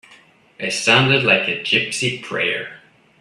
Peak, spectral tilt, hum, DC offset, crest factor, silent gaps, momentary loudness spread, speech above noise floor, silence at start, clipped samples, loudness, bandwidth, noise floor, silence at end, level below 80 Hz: 0 dBFS; -3.5 dB/octave; none; under 0.1%; 20 dB; none; 12 LU; 32 dB; 0.6 s; under 0.1%; -17 LUFS; 13 kHz; -50 dBFS; 0.45 s; -60 dBFS